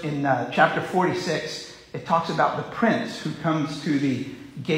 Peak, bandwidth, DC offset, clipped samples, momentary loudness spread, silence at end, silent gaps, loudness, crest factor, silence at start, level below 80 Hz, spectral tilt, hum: -4 dBFS; 16 kHz; under 0.1%; under 0.1%; 13 LU; 0 s; none; -24 LUFS; 20 dB; 0 s; -62 dBFS; -5.5 dB/octave; none